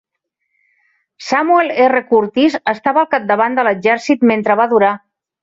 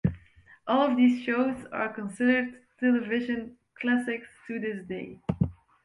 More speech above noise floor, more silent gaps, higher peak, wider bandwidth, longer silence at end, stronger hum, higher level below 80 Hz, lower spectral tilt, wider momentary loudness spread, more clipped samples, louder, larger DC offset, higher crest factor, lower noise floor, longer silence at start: first, 60 dB vs 29 dB; neither; first, -2 dBFS vs -10 dBFS; second, 7.8 kHz vs 11 kHz; first, 0.45 s vs 0.3 s; neither; second, -62 dBFS vs -52 dBFS; second, -5.5 dB/octave vs -7.5 dB/octave; second, 5 LU vs 14 LU; neither; first, -14 LUFS vs -28 LUFS; neither; about the same, 14 dB vs 18 dB; first, -73 dBFS vs -56 dBFS; first, 1.2 s vs 0.05 s